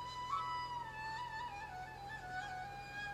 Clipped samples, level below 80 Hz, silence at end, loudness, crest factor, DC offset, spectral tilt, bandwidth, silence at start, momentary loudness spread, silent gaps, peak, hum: under 0.1%; -64 dBFS; 0 s; -44 LUFS; 16 dB; under 0.1%; -3.5 dB/octave; 15 kHz; 0 s; 7 LU; none; -30 dBFS; none